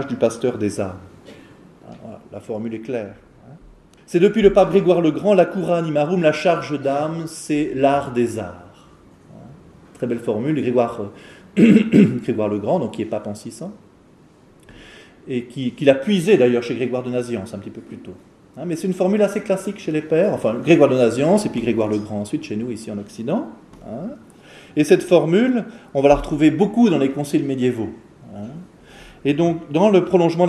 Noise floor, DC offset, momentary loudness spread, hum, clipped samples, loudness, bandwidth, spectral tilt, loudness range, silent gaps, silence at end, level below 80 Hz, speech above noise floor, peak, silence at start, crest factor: -50 dBFS; under 0.1%; 19 LU; none; under 0.1%; -19 LUFS; 13 kHz; -7 dB/octave; 8 LU; none; 0 s; -48 dBFS; 32 dB; 0 dBFS; 0 s; 20 dB